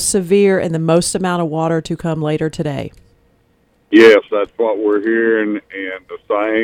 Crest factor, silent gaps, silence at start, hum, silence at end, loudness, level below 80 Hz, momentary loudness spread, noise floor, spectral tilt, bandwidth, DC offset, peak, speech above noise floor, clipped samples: 16 dB; none; 0 s; none; 0 s; -15 LUFS; -48 dBFS; 16 LU; -57 dBFS; -5 dB/octave; 16.5 kHz; under 0.1%; 0 dBFS; 42 dB; under 0.1%